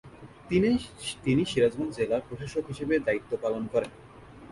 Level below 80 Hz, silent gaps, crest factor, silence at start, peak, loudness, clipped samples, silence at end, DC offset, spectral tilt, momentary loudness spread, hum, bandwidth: -54 dBFS; none; 16 dB; 0.05 s; -12 dBFS; -28 LUFS; under 0.1%; 0.05 s; under 0.1%; -6 dB/octave; 9 LU; none; 11.5 kHz